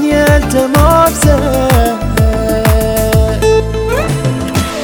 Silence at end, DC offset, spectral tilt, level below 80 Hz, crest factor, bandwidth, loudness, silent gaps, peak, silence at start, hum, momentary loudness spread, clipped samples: 0 s; under 0.1%; -5.5 dB/octave; -16 dBFS; 10 dB; over 20 kHz; -11 LUFS; none; 0 dBFS; 0 s; none; 6 LU; 0.6%